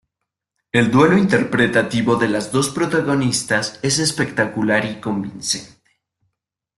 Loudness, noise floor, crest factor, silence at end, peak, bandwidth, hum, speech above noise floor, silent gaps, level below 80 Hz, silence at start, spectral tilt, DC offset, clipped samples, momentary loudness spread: -18 LUFS; -80 dBFS; 18 dB; 1.1 s; -2 dBFS; 12.5 kHz; none; 63 dB; none; -52 dBFS; 0.75 s; -4.5 dB/octave; under 0.1%; under 0.1%; 9 LU